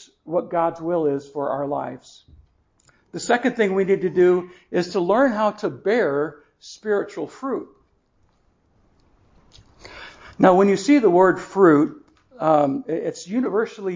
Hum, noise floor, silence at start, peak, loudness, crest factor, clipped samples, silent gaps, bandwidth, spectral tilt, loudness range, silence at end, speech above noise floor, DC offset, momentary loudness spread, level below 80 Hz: none; -63 dBFS; 0.25 s; 0 dBFS; -20 LUFS; 22 dB; under 0.1%; none; 7.6 kHz; -6.5 dB/octave; 13 LU; 0 s; 43 dB; under 0.1%; 15 LU; -60 dBFS